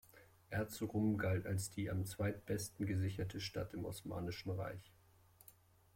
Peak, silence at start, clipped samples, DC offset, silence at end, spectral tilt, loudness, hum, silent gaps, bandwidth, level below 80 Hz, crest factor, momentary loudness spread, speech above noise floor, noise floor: -26 dBFS; 0.15 s; under 0.1%; under 0.1%; 0.45 s; -6 dB/octave; -42 LUFS; none; none; 16.5 kHz; -66 dBFS; 16 dB; 11 LU; 27 dB; -68 dBFS